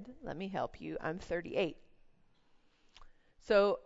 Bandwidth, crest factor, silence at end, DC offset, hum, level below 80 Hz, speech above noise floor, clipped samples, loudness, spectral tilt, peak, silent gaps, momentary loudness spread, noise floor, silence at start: 7.6 kHz; 20 dB; 0.05 s; under 0.1%; none; -60 dBFS; 33 dB; under 0.1%; -36 LUFS; -4 dB/octave; -16 dBFS; none; 12 LU; -68 dBFS; 0 s